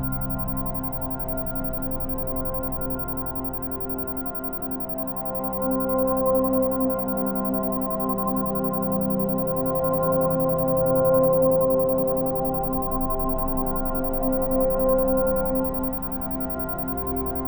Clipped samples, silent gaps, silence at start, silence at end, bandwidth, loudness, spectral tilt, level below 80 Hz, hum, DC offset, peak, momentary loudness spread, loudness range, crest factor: under 0.1%; none; 0 s; 0 s; over 20 kHz; -24 LUFS; -11 dB/octave; -36 dBFS; none; 0.5%; -10 dBFS; 7 LU; 6 LU; 14 dB